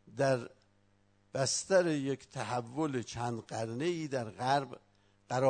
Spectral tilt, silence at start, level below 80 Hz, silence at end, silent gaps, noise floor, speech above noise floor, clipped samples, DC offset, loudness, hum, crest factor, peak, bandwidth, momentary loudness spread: -4.5 dB/octave; 0.05 s; -70 dBFS; 0 s; none; -69 dBFS; 35 dB; under 0.1%; under 0.1%; -34 LUFS; 50 Hz at -65 dBFS; 20 dB; -16 dBFS; 9.6 kHz; 10 LU